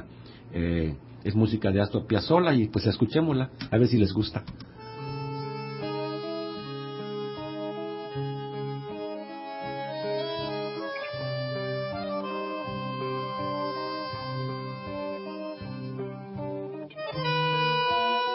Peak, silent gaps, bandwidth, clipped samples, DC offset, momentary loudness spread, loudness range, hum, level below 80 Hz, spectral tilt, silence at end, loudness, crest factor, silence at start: -8 dBFS; none; 5.8 kHz; under 0.1%; under 0.1%; 12 LU; 10 LU; none; -50 dBFS; -10.5 dB/octave; 0 s; -30 LUFS; 20 dB; 0 s